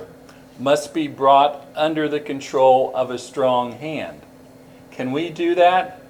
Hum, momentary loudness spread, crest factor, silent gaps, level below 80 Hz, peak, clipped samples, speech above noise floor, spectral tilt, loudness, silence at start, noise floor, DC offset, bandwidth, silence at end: none; 12 LU; 18 dB; none; -62 dBFS; -2 dBFS; under 0.1%; 26 dB; -5 dB/octave; -19 LUFS; 0 s; -45 dBFS; under 0.1%; 15.5 kHz; 0.1 s